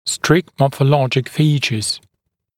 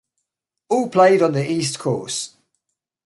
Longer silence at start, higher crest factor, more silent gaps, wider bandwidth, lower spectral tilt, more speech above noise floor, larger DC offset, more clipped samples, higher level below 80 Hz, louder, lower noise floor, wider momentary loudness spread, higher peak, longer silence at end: second, 0.05 s vs 0.7 s; about the same, 18 dB vs 18 dB; neither; first, 16 kHz vs 11.5 kHz; about the same, -5 dB/octave vs -5 dB/octave; second, 58 dB vs 62 dB; neither; neither; first, -52 dBFS vs -66 dBFS; about the same, -17 LUFS vs -19 LUFS; second, -74 dBFS vs -80 dBFS; second, 6 LU vs 12 LU; first, 0 dBFS vs -4 dBFS; second, 0.6 s vs 0.8 s